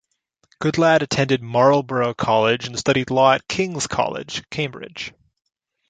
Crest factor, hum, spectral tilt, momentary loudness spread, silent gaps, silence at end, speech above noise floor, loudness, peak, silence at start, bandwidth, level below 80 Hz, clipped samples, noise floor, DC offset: 18 dB; none; -4.5 dB/octave; 12 LU; none; 0.8 s; 48 dB; -19 LUFS; -2 dBFS; 0.6 s; 9.4 kHz; -54 dBFS; under 0.1%; -68 dBFS; under 0.1%